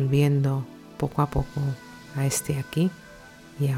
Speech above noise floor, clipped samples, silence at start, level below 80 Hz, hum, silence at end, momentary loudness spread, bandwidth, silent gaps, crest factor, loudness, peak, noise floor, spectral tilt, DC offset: 22 dB; under 0.1%; 0 s; -44 dBFS; none; 0 s; 21 LU; 16.5 kHz; none; 16 dB; -26 LUFS; -10 dBFS; -47 dBFS; -6 dB/octave; under 0.1%